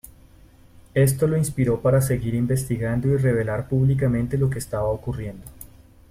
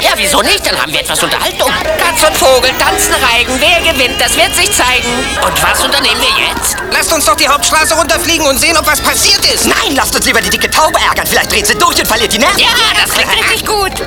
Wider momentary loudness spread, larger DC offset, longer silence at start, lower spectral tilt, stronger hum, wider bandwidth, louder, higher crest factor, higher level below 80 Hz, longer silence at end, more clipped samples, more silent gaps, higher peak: first, 9 LU vs 4 LU; neither; first, 0.95 s vs 0 s; first, -7.5 dB/octave vs -1.5 dB/octave; neither; second, 15.5 kHz vs 19.5 kHz; second, -22 LUFS vs -8 LUFS; first, 16 dB vs 10 dB; second, -42 dBFS vs -28 dBFS; first, 0.45 s vs 0 s; second, under 0.1% vs 0.2%; neither; second, -8 dBFS vs 0 dBFS